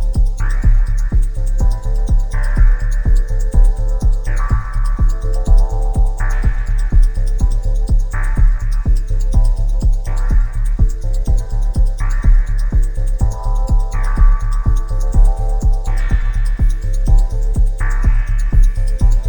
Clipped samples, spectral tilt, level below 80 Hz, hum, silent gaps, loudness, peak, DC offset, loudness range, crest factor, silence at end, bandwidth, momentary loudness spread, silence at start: under 0.1%; -7 dB/octave; -12 dBFS; none; none; -19 LUFS; 0 dBFS; under 0.1%; 1 LU; 12 dB; 0 s; 9 kHz; 4 LU; 0 s